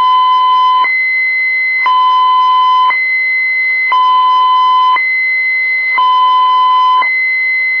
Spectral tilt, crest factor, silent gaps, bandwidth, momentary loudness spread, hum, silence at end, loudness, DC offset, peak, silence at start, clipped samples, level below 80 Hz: 1 dB/octave; 6 dB; none; 5.4 kHz; 1 LU; none; 0 s; -9 LUFS; 0.3%; -4 dBFS; 0 s; under 0.1%; -70 dBFS